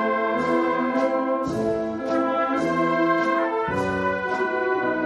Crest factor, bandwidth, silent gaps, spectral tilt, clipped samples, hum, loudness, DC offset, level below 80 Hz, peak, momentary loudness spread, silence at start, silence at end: 14 dB; 11.5 kHz; none; -6.5 dB/octave; under 0.1%; none; -23 LUFS; under 0.1%; -56 dBFS; -10 dBFS; 4 LU; 0 s; 0 s